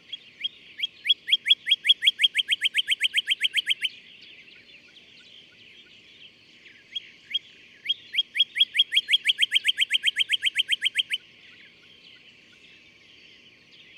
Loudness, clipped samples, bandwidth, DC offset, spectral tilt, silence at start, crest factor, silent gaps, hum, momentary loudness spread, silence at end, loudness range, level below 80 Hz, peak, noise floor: -22 LUFS; under 0.1%; 16 kHz; under 0.1%; 3 dB/octave; 0.1 s; 20 dB; none; none; 13 LU; 2.8 s; 14 LU; -80 dBFS; -8 dBFS; -53 dBFS